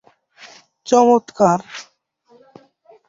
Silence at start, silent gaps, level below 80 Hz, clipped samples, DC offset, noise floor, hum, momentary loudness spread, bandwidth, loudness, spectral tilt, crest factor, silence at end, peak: 0.85 s; none; -66 dBFS; under 0.1%; under 0.1%; -57 dBFS; none; 22 LU; 7.8 kHz; -16 LUFS; -5.5 dB/octave; 18 dB; 1.25 s; -2 dBFS